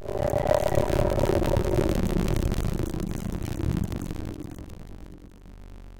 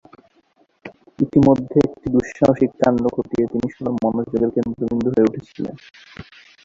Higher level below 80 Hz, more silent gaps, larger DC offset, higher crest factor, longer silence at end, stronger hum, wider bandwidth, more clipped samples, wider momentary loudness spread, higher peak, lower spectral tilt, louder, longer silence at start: first, -32 dBFS vs -48 dBFS; neither; neither; about the same, 18 dB vs 18 dB; second, 0 s vs 0.45 s; neither; first, 17 kHz vs 7.6 kHz; neither; first, 20 LU vs 15 LU; second, -8 dBFS vs -2 dBFS; second, -7 dB/octave vs -8.5 dB/octave; second, -27 LUFS vs -19 LUFS; second, 0 s vs 0.85 s